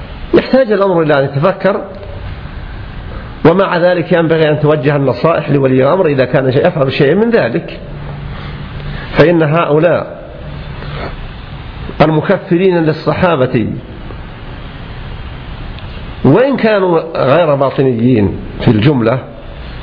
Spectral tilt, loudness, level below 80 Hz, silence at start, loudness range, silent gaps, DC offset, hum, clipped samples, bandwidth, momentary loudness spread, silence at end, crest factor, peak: -9.5 dB/octave; -11 LUFS; -30 dBFS; 0 s; 4 LU; none; under 0.1%; none; under 0.1%; 5.4 kHz; 18 LU; 0 s; 12 dB; 0 dBFS